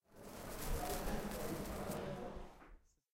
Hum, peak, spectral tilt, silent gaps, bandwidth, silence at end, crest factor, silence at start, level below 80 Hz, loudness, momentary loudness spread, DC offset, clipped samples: none; -26 dBFS; -4.5 dB/octave; none; 16.5 kHz; 0.35 s; 18 dB; 0.1 s; -50 dBFS; -45 LUFS; 14 LU; under 0.1%; under 0.1%